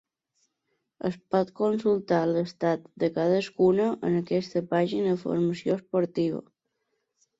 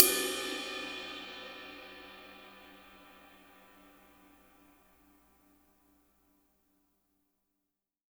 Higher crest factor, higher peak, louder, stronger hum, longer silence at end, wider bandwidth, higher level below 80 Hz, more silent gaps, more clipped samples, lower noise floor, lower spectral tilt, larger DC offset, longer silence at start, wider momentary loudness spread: second, 16 dB vs 38 dB; second, -10 dBFS vs 0 dBFS; first, -27 LUFS vs -35 LUFS; second, none vs 60 Hz at -85 dBFS; second, 1 s vs 4.85 s; second, 7.8 kHz vs over 20 kHz; about the same, -68 dBFS vs -72 dBFS; neither; neither; second, -78 dBFS vs -87 dBFS; first, -7.5 dB/octave vs 0 dB/octave; neither; first, 1.05 s vs 0 s; second, 6 LU vs 24 LU